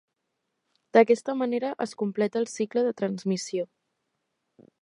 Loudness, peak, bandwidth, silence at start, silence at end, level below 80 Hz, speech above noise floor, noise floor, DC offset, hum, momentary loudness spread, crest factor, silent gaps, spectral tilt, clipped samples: -26 LUFS; -4 dBFS; 11 kHz; 0.95 s; 1.15 s; -80 dBFS; 55 dB; -80 dBFS; under 0.1%; none; 10 LU; 24 dB; none; -5.5 dB/octave; under 0.1%